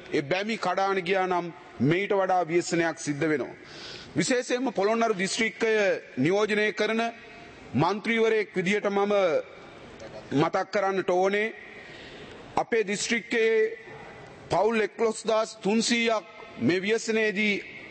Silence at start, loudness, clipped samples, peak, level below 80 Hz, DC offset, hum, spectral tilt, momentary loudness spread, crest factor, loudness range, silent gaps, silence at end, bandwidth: 0 s; -26 LUFS; under 0.1%; -10 dBFS; -64 dBFS; under 0.1%; none; -4.5 dB/octave; 19 LU; 16 dB; 2 LU; none; 0 s; 8.8 kHz